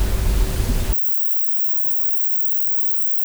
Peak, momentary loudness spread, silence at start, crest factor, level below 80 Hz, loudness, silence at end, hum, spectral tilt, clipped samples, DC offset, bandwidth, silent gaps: -6 dBFS; 7 LU; 0 s; 12 dB; -24 dBFS; -17 LUFS; 0 s; none; -5 dB/octave; under 0.1%; under 0.1%; over 20 kHz; none